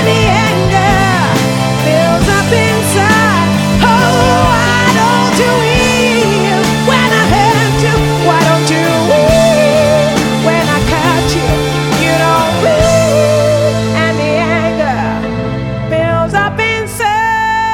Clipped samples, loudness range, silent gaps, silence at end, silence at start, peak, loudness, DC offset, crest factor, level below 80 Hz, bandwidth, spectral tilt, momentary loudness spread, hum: under 0.1%; 3 LU; none; 0 s; 0 s; 0 dBFS; -10 LUFS; under 0.1%; 10 dB; -28 dBFS; 18 kHz; -5 dB/octave; 4 LU; none